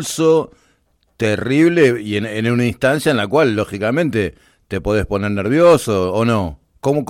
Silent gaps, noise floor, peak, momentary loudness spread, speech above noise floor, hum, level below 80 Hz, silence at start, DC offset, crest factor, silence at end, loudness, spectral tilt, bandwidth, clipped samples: none; -60 dBFS; -2 dBFS; 10 LU; 45 dB; none; -42 dBFS; 0 s; under 0.1%; 14 dB; 0.05 s; -16 LUFS; -6 dB/octave; 16 kHz; under 0.1%